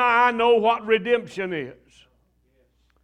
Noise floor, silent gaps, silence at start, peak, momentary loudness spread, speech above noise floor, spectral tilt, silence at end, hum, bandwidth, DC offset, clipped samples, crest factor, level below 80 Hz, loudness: -64 dBFS; none; 0 s; -6 dBFS; 12 LU; 42 dB; -5 dB/octave; 1.3 s; none; 9.4 kHz; under 0.1%; under 0.1%; 18 dB; -62 dBFS; -21 LUFS